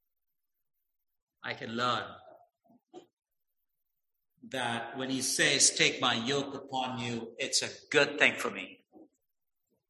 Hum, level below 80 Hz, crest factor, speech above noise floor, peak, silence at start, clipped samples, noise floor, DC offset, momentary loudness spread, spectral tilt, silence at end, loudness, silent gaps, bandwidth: none; -76 dBFS; 24 dB; 55 dB; -8 dBFS; 1.45 s; under 0.1%; -85 dBFS; under 0.1%; 17 LU; -1.5 dB/octave; 0.85 s; -29 LUFS; 3.13-3.17 s; 13 kHz